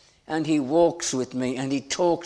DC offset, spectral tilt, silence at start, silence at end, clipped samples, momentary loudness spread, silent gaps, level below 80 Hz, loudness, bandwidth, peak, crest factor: under 0.1%; -4.5 dB/octave; 0.3 s; 0 s; under 0.1%; 7 LU; none; -60 dBFS; -25 LUFS; 11 kHz; -8 dBFS; 16 dB